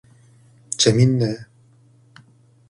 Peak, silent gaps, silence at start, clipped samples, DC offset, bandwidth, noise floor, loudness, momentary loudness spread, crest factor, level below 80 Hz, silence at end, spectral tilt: -2 dBFS; none; 0.7 s; under 0.1%; under 0.1%; 11 kHz; -53 dBFS; -18 LUFS; 16 LU; 20 dB; -56 dBFS; 1.25 s; -5 dB/octave